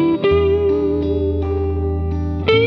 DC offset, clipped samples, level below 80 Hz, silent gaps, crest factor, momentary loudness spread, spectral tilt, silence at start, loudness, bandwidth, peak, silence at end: under 0.1%; under 0.1%; -28 dBFS; none; 14 dB; 6 LU; -9 dB/octave; 0 s; -18 LUFS; 6 kHz; -4 dBFS; 0 s